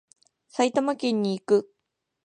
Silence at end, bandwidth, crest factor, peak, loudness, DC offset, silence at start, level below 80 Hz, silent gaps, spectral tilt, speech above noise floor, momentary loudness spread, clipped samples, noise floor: 0.6 s; 10 kHz; 18 dB; -8 dBFS; -25 LUFS; under 0.1%; 0.55 s; -80 dBFS; none; -5.5 dB/octave; 57 dB; 3 LU; under 0.1%; -81 dBFS